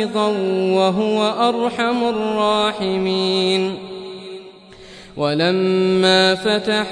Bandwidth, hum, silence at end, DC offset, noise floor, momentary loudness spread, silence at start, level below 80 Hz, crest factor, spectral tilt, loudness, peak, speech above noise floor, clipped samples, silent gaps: 10.5 kHz; none; 0 s; under 0.1%; -41 dBFS; 17 LU; 0 s; -56 dBFS; 14 dB; -5 dB/octave; -17 LUFS; -4 dBFS; 23 dB; under 0.1%; none